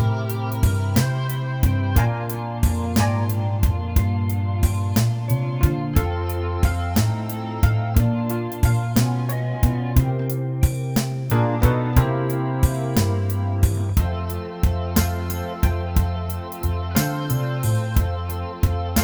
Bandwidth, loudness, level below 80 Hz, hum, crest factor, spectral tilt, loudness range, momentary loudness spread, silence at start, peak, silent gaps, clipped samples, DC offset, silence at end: over 20 kHz; -22 LUFS; -26 dBFS; none; 18 dB; -6.5 dB/octave; 2 LU; 5 LU; 0 s; -2 dBFS; none; under 0.1%; under 0.1%; 0 s